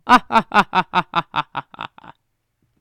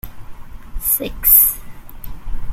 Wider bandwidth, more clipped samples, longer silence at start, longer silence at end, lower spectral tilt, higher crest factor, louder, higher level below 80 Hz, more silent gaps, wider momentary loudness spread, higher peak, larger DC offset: about the same, 18.5 kHz vs 17 kHz; neither; about the same, 0.05 s vs 0.05 s; first, 0.95 s vs 0 s; first, -4.5 dB/octave vs -2.5 dB/octave; about the same, 20 dB vs 18 dB; second, -18 LUFS vs -12 LUFS; second, -48 dBFS vs -30 dBFS; neither; second, 20 LU vs 25 LU; about the same, 0 dBFS vs 0 dBFS; neither